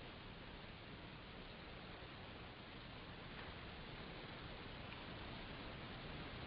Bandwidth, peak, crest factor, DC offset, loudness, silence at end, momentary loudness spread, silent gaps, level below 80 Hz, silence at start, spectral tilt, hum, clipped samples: 5.4 kHz; -38 dBFS; 14 dB; under 0.1%; -53 LUFS; 0 s; 3 LU; none; -62 dBFS; 0 s; -3.5 dB/octave; none; under 0.1%